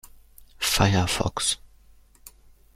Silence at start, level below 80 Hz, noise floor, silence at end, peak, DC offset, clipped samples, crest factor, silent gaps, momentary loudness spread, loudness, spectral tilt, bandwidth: 0.6 s; -44 dBFS; -54 dBFS; 1.2 s; -4 dBFS; under 0.1%; under 0.1%; 24 dB; none; 7 LU; -24 LUFS; -3.5 dB/octave; 16 kHz